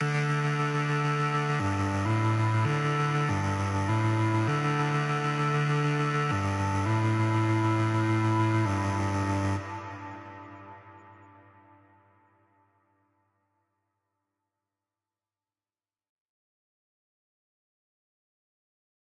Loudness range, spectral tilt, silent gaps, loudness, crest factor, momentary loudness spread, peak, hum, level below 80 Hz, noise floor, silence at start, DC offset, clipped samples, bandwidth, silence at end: 8 LU; -6.5 dB/octave; none; -27 LUFS; 12 dB; 10 LU; -18 dBFS; none; -66 dBFS; under -90 dBFS; 0 s; under 0.1%; under 0.1%; 11.5 kHz; 8.05 s